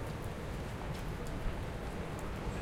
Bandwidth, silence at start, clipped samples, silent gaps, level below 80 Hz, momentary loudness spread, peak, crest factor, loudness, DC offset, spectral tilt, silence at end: 16 kHz; 0 s; under 0.1%; none; -44 dBFS; 1 LU; -24 dBFS; 16 dB; -41 LUFS; under 0.1%; -6 dB/octave; 0 s